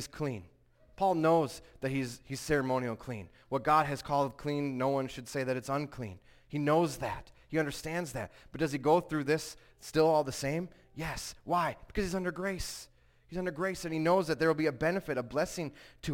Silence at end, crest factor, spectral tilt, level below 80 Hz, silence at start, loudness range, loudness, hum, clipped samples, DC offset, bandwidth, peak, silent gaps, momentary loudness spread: 0 s; 18 dB; -5.5 dB/octave; -56 dBFS; 0 s; 3 LU; -33 LUFS; none; under 0.1%; under 0.1%; 17 kHz; -14 dBFS; none; 13 LU